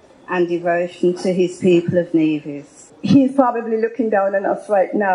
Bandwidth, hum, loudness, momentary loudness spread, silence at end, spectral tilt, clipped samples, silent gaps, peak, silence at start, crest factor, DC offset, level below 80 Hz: 11 kHz; none; -18 LUFS; 8 LU; 0 s; -7 dB/octave; under 0.1%; none; 0 dBFS; 0.3 s; 18 dB; under 0.1%; -64 dBFS